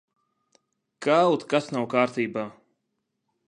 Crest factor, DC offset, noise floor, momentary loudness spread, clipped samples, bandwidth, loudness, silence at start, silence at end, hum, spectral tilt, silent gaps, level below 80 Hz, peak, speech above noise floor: 20 dB; under 0.1%; -79 dBFS; 11 LU; under 0.1%; 11 kHz; -24 LUFS; 1 s; 0.95 s; none; -5.5 dB/octave; none; -76 dBFS; -6 dBFS; 55 dB